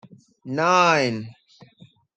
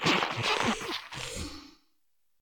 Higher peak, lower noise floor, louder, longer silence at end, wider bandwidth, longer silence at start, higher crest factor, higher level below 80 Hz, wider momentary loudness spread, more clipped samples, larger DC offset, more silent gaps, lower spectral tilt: first, -4 dBFS vs -14 dBFS; second, -53 dBFS vs -80 dBFS; first, -20 LUFS vs -30 LUFS; first, 0.85 s vs 0.7 s; second, 9.4 kHz vs 18 kHz; first, 0.45 s vs 0 s; about the same, 20 dB vs 20 dB; second, -68 dBFS vs -54 dBFS; about the same, 16 LU vs 14 LU; neither; neither; neither; first, -4.5 dB/octave vs -3 dB/octave